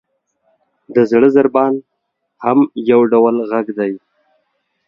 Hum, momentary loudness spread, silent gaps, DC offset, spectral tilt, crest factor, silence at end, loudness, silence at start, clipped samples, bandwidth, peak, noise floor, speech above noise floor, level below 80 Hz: none; 11 LU; none; under 0.1%; -8.5 dB/octave; 16 dB; 0.9 s; -14 LUFS; 0.9 s; under 0.1%; 6.8 kHz; 0 dBFS; -67 dBFS; 54 dB; -60 dBFS